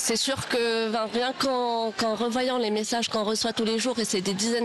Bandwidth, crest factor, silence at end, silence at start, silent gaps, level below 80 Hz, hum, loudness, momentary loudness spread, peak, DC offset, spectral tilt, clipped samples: 12 kHz; 10 dB; 0 s; 0 s; none; -62 dBFS; none; -26 LUFS; 2 LU; -16 dBFS; under 0.1%; -3 dB/octave; under 0.1%